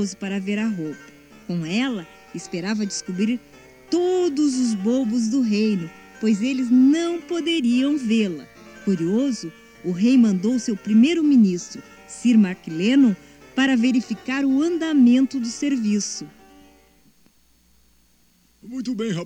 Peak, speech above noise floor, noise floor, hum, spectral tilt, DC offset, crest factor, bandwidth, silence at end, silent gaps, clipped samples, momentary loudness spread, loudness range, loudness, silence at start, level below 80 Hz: -8 dBFS; 40 dB; -60 dBFS; none; -5.5 dB/octave; under 0.1%; 14 dB; 10 kHz; 0 s; none; under 0.1%; 16 LU; 7 LU; -21 LUFS; 0 s; -62 dBFS